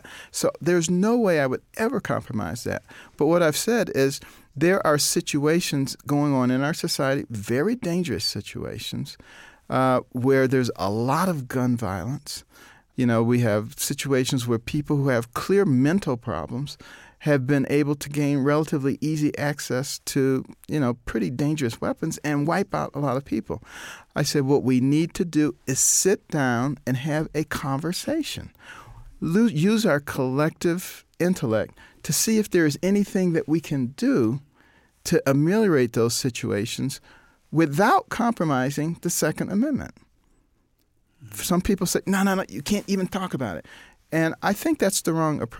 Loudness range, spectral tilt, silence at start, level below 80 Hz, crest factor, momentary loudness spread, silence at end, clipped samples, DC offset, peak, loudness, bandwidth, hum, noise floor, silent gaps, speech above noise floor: 4 LU; -5 dB/octave; 0.05 s; -52 dBFS; 16 dB; 11 LU; 0 s; under 0.1%; under 0.1%; -8 dBFS; -24 LUFS; 17 kHz; none; -66 dBFS; none; 42 dB